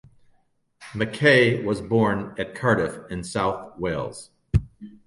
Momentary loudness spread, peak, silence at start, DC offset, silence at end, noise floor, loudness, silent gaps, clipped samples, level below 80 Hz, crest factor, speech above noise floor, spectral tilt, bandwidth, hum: 16 LU; -4 dBFS; 0.8 s; under 0.1%; 0.15 s; -65 dBFS; -23 LUFS; none; under 0.1%; -42 dBFS; 20 dB; 42 dB; -6 dB/octave; 11.5 kHz; none